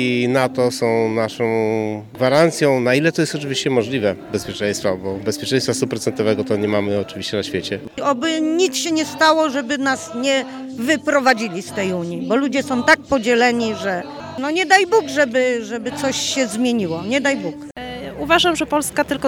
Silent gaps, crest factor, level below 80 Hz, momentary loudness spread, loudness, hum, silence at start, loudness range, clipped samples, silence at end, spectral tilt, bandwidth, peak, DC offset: none; 18 dB; -54 dBFS; 9 LU; -18 LUFS; none; 0 s; 3 LU; under 0.1%; 0 s; -4 dB/octave; 18 kHz; 0 dBFS; under 0.1%